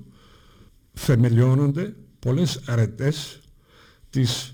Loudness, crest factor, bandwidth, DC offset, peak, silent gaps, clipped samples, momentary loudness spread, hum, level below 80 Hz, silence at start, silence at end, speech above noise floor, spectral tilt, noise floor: -22 LUFS; 16 dB; 16.5 kHz; under 0.1%; -8 dBFS; none; under 0.1%; 13 LU; none; -48 dBFS; 0.95 s; 0 s; 33 dB; -6.5 dB/octave; -54 dBFS